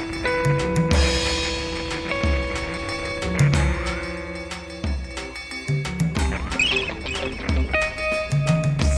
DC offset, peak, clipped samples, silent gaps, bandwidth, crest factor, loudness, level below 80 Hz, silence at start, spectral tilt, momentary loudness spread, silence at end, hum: under 0.1%; -6 dBFS; under 0.1%; none; 11 kHz; 16 dB; -23 LUFS; -30 dBFS; 0 s; -5 dB/octave; 11 LU; 0 s; none